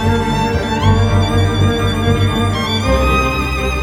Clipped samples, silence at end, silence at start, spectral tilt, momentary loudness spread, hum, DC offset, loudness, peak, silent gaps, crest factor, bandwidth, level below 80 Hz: under 0.1%; 0 s; 0 s; -6 dB/octave; 3 LU; none; under 0.1%; -15 LUFS; -2 dBFS; none; 12 dB; 15 kHz; -22 dBFS